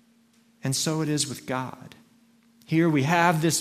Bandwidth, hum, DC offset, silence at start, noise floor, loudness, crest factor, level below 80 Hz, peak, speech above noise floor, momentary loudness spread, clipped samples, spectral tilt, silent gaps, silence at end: 16 kHz; none; under 0.1%; 0.65 s; -61 dBFS; -24 LUFS; 20 dB; -68 dBFS; -6 dBFS; 37 dB; 13 LU; under 0.1%; -4.5 dB/octave; none; 0 s